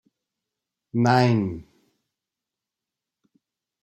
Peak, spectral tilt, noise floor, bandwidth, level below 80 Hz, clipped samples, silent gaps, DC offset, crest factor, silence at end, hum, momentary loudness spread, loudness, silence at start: -4 dBFS; -7 dB/octave; -87 dBFS; 12 kHz; -62 dBFS; under 0.1%; none; under 0.1%; 22 dB; 2.2 s; none; 13 LU; -22 LUFS; 0.95 s